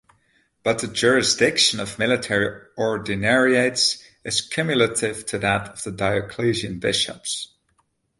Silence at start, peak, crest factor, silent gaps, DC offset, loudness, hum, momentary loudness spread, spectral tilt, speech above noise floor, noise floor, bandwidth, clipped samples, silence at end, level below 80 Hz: 0.65 s; -4 dBFS; 20 dB; none; under 0.1%; -21 LUFS; none; 10 LU; -3 dB/octave; 46 dB; -68 dBFS; 11.5 kHz; under 0.1%; 0.75 s; -52 dBFS